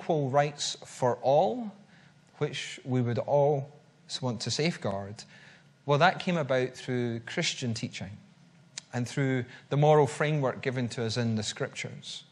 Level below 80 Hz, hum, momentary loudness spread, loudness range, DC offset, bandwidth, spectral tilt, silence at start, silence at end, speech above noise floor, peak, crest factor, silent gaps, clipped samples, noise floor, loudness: -72 dBFS; none; 15 LU; 3 LU; under 0.1%; 11.5 kHz; -5 dB/octave; 0 s; 0.1 s; 29 dB; -8 dBFS; 22 dB; none; under 0.1%; -58 dBFS; -29 LUFS